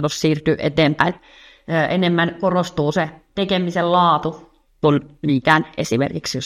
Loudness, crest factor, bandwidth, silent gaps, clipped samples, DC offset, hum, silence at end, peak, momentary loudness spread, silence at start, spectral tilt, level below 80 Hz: -19 LUFS; 18 dB; 14 kHz; none; under 0.1%; under 0.1%; none; 0 s; 0 dBFS; 7 LU; 0 s; -5.5 dB/octave; -50 dBFS